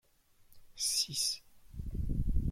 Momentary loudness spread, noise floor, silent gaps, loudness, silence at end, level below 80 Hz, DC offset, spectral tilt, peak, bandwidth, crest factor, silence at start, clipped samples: 15 LU; -65 dBFS; none; -34 LUFS; 0 s; -40 dBFS; under 0.1%; -2.5 dB/octave; -18 dBFS; 16 kHz; 18 dB; 0.5 s; under 0.1%